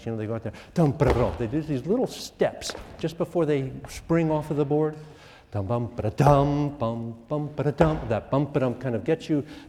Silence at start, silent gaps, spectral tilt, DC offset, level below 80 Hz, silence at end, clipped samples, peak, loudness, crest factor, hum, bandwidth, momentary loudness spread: 0 s; none; -7.5 dB/octave; under 0.1%; -44 dBFS; 0 s; under 0.1%; -4 dBFS; -26 LUFS; 22 dB; none; 14 kHz; 11 LU